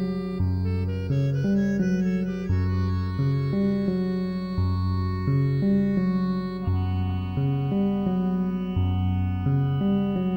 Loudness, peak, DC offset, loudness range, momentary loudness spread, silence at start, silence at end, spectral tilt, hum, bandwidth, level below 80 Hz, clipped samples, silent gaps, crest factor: -25 LUFS; -12 dBFS; under 0.1%; 1 LU; 4 LU; 0 s; 0 s; -9.5 dB/octave; none; 6.4 kHz; -44 dBFS; under 0.1%; none; 12 dB